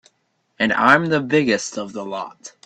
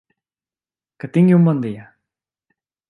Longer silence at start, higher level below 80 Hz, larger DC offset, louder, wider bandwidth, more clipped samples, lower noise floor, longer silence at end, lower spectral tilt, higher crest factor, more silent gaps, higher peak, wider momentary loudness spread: second, 0.6 s vs 1.05 s; first, -60 dBFS vs -66 dBFS; neither; about the same, -18 LUFS vs -16 LUFS; first, 10 kHz vs 4 kHz; neither; second, -68 dBFS vs under -90 dBFS; second, 0.15 s vs 1.05 s; second, -4.5 dB/octave vs -10.5 dB/octave; about the same, 20 dB vs 16 dB; neither; first, 0 dBFS vs -4 dBFS; second, 15 LU vs 22 LU